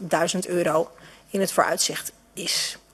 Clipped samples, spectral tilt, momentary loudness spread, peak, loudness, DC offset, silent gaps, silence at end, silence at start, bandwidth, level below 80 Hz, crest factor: under 0.1%; -2.5 dB/octave; 10 LU; -4 dBFS; -24 LUFS; under 0.1%; none; 0.15 s; 0 s; 14.5 kHz; -64 dBFS; 20 dB